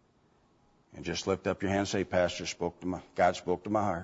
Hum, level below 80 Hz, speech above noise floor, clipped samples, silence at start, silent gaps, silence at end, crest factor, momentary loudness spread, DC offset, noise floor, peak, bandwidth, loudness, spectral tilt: none; -60 dBFS; 36 dB; under 0.1%; 0.95 s; none; 0 s; 18 dB; 8 LU; under 0.1%; -67 dBFS; -14 dBFS; 8 kHz; -31 LUFS; -5 dB/octave